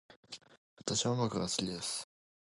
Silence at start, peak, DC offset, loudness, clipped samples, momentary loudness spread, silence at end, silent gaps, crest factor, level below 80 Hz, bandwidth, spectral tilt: 0.1 s; -16 dBFS; under 0.1%; -35 LUFS; under 0.1%; 18 LU; 0.45 s; 0.16-0.23 s, 0.57-0.77 s; 22 dB; -66 dBFS; 11.5 kHz; -4 dB/octave